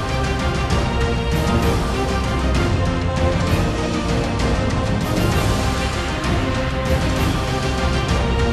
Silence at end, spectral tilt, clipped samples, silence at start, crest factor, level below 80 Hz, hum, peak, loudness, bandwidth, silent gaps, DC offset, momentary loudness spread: 0 s; -5.5 dB/octave; under 0.1%; 0 s; 12 dB; -24 dBFS; none; -8 dBFS; -20 LUFS; 14 kHz; none; under 0.1%; 2 LU